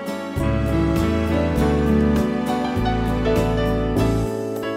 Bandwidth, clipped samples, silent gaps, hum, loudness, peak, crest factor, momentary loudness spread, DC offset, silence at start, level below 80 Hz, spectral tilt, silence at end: 16 kHz; under 0.1%; none; none; -21 LUFS; -8 dBFS; 12 dB; 5 LU; under 0.1%; 0 s; -28 dBFS; -7.5 dB/octave; 0 s